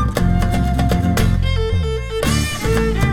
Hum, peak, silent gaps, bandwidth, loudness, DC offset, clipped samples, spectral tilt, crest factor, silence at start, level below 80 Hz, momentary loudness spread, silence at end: none; -2 dBFS; none; 17.5 kHz; -18 LUFS; under 0.1%; under 0.1%; -6 dB/octave; 14 dB; 0 s; -22 dBFS; 3 LU; 0 s